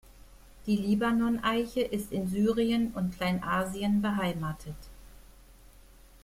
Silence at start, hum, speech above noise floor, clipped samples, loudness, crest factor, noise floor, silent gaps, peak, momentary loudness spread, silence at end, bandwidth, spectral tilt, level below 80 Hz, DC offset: 0.1 s; none; 26 dB; under 0.1%; -29 LUFS; 16 dB; -54 dBFS; none; -14 dBFS; 10 LU; 0.7 s; 16 kHz; -6 dB/octave; -52 dBFS; under 0.1%